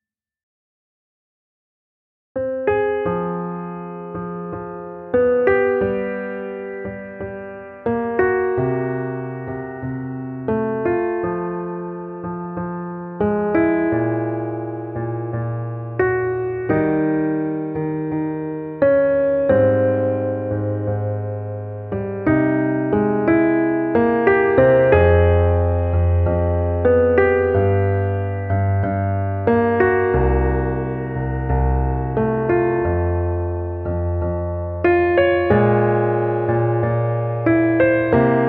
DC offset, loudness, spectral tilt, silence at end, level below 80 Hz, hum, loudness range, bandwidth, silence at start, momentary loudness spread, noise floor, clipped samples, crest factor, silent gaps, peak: under 0.1%; -19 LUFS; -12 dB/octave; 0 s; -34 dBFS; none; 8 LU; 4.2 kHz; 2.35 s; 13 LU; under -90 dBFS; under 0.1%; 18 dB; none; -2 dBFS